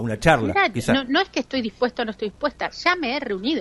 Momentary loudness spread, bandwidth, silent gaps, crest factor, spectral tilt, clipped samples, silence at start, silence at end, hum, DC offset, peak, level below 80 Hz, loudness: 8 LU; 11.5 kHz; none; 20 dB; -5 dB/octave; under 0.1%; 0 s; 0 s; none; under 0.1%; -2 dBFS; -46 dBFS; -22 LUFS